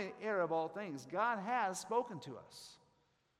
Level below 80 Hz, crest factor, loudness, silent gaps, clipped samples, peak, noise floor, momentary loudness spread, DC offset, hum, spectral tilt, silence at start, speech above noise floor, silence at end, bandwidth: -84 dBFS; 18 dB; -38 LUFS; none; under 0.1%; -22 dBFS; -77 dBFS; 17 LU; under 0.1%; none; -4.5 dB/octave; 0 s; 38 dB; 0.65 s; 15.5 kHz